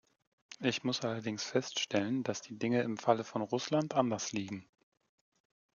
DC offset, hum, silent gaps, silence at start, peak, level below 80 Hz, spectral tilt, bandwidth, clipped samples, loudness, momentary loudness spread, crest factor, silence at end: under 0.1%; none; none; 0.5 s; -12 dBFS; -80 dBFS; -4.5 dB/octave; 7.4 kHz; under 0.1%; -34 LUFS; 7 LU; 22 dB; 1.15 s